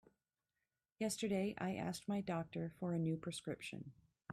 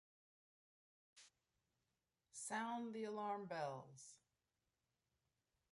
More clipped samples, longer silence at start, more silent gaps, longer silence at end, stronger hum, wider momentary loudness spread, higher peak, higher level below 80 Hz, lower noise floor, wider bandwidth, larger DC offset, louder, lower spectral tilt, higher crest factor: neither; second, 1 s vs 1.15 s; neither; second, 0 s vs 1.55 s; neither; second, 10 LU vs 20 LU; first, -30 dBFS vs -34 dBFS; first, -74 dBFS vs under -90 dBFS; about the same, under -90 dBFS vs under -90 dBFS; first, 15 kHz vs 11.5 kHz; neither; first, -43 LUFS vs -48 LUFS; first, -5.5 dB/octave vs -4 dB/octave; second, 14 dB vs 20 dB